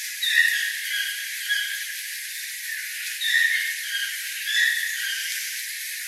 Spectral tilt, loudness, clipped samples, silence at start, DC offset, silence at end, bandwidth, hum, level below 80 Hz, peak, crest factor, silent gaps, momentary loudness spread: 14 dB/octave; -24 LUFS; under 0.1%; 0 s; under 0.1%; 0 s; 16 kHz; none; under -90 dBFS; -6 dBFS; 20 dB; none; 10 LU